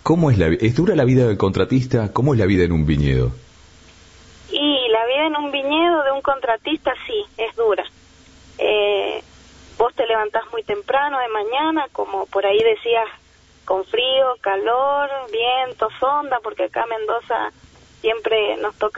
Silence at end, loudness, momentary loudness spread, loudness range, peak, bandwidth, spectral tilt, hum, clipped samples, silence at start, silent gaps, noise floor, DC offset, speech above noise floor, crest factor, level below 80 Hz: 0 s; -19 LUFS; 8 LU; 4 LU; -4 dBFS; 8 kHz; -7 dB/octave; none; under 0.1%; 0.05 s; none; -47 dBFS; under 0.1%; 29 dB; 16 dB; -40 dBFS